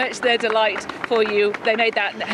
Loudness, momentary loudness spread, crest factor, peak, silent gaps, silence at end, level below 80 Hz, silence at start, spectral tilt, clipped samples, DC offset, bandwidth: -20 LUFS; 5 LU; 16 dB; -4 dBFS; none; 0 s; -62 dBFS; 0 s; -3 dB/octave; under 0.1%; under 0.1%; 11.5 kHz